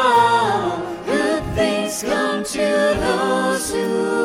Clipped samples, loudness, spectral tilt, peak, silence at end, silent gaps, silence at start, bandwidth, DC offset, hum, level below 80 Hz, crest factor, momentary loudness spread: under 0.1%; -19 LUFS; -4 dB/octave; -4 dBFS; 0 s; none; 0 s; 16.5 kHz; under 0.1%; none; -42 dBFS; 14 dB; 6 LU